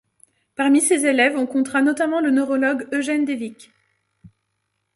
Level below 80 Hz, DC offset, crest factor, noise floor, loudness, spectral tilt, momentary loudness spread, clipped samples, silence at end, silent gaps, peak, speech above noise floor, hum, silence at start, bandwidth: -68 dBFS; under 0.1%; 18 dB; -74 dBFS; -19 LUFS; -2.5 dB/octave; 9 LU; under 0.1%; 0.7 s; none; -2 dBFS; 55 dB; none; 0.6 s; 11.5 kHz